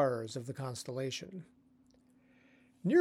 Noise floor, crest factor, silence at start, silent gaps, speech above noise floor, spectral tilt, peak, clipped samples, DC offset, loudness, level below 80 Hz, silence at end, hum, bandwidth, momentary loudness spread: -67 dBFS; 20 dB; 0 s; none; 28 dB; -5.5 dB/octave; -18 dBFS; under 0.1%; under 0.1%; -38 LUFS; -80 dBFS; 0 s; none; 15.5 kHz; 17 LU